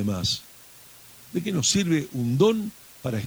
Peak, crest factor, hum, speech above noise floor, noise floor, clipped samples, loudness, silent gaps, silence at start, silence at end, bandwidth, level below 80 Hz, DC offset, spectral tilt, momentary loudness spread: -6 dBFS; 18 dB; none; 25 dB; -49 dBFS; under 0.1%; -25 LUFS; none; 0 s; 0 s; over 20 kHz; -54 dBFS; under 0.1%; -4.5 dB/octave; 13 LU